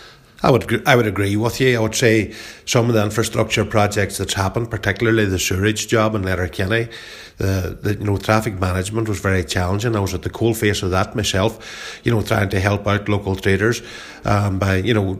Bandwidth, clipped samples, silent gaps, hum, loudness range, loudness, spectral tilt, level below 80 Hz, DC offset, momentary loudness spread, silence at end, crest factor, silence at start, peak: 16 kHz; under 0.1%; none; none; 3 LU; -19 LUFS; -5 dB/octave; -40 dBFS; under 0.1%; 6 LU; 0 s; 18 dB; 0 s; 0 dBFS